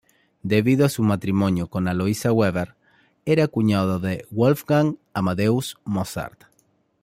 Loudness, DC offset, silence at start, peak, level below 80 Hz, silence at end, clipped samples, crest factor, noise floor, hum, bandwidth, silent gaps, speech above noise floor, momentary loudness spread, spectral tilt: -22 LUFS; under 0.1%; 0.45 s; -4 dBFS; -56 dBFS; 0.75 s; under 0.1%; 18 dB; -64 dBFS; none; 16 kHz; none; 43 dB; 10 LU; -7 dB/octave